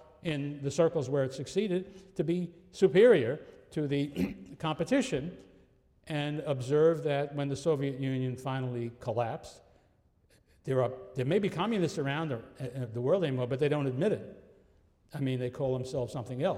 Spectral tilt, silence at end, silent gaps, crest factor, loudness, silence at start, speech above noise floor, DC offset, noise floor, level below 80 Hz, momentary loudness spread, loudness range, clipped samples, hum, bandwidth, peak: -6.5 dB/octave; 0 s; none; 20 dB; -31 LUFS; 0 s; 37 dB; under 0.1%; -67 dBFS; -64 dBFS; 11 LU; 6 LU; under 0.1%; none; 13 kHz; -12 dBFS